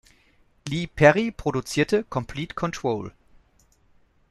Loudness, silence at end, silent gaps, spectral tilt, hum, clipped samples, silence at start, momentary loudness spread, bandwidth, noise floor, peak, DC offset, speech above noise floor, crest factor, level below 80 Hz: -24 LUFS; 1.2 s; none; -5.5 dB/octave; none; under 0.1%; 0.65 s; 14 LU; 12.5 kHz; -61 dBFS; -2 dBFS; under 0.1%; 38 dB; 22 dB; -48 dBFS